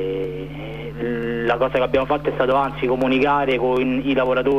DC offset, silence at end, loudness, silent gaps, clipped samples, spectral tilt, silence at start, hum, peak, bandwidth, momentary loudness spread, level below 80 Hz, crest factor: 0.5%; 0 s; -20 LUFS; none; under 0.1%; -7.5 dB/octave; 0 s; 50 Hz at -35 dBFS; -6 dBFS; 14 kHz; 10 LU; -42 dBFS; 14 dB